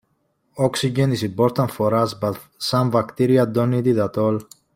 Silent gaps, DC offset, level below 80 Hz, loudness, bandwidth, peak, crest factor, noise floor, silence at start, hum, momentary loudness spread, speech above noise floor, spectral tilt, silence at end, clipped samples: none; under 0.1%; -58 dBFS; -20 LUFS; 16.5 kHz; -4 dBFS; 16 dB; -68 dBFS; 0.55 s; none; 8 LU; 48 dB; -6.5 dB/octave; 0.3 s; under 0.1%